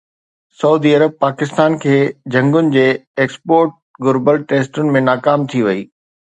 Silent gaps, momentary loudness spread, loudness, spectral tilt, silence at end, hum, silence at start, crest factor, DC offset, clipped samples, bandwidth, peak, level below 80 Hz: 3.07-3.14 s, 3.82-3.94 s; 6 LU; -15 LUFS; -7 dB/octave; 0.45 s; none; 0.6 s; 14 dB; under 0.1%; under 0.1%; 9.2 kHz; 0 dBFS; -62 dBFS